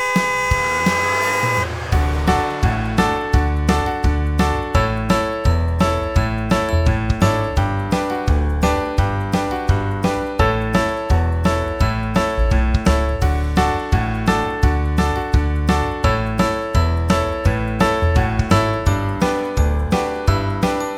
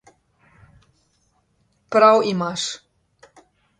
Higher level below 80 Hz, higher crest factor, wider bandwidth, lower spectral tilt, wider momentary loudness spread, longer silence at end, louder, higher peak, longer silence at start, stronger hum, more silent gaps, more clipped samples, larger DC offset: first, -22 dBFS vs -66 dBFS; about the same, 18 dB vs 22 dB; first, 15.5 kHz vs 10 kHz; first, -6 dB/octave vs -4 dB/octave; second, 3 LU vs 14 LU; second, 0 s vs 1.05 s; about the same, -18 LUFS vs -18 LUFS; about the same, 0 dBFS vs -2 dBFS; second, 0 s vs 1.9 s; neither; neither; neither; neither